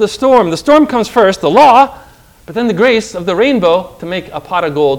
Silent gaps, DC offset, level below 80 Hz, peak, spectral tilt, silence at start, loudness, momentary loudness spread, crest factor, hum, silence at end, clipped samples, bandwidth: none; under 0.1%; -44 dBFS; 0 dBFS; -5 dB/octave; 0 s; -11 LUFS; 13 LU; 10 dB; none; 0 s; 2%; 17 kHz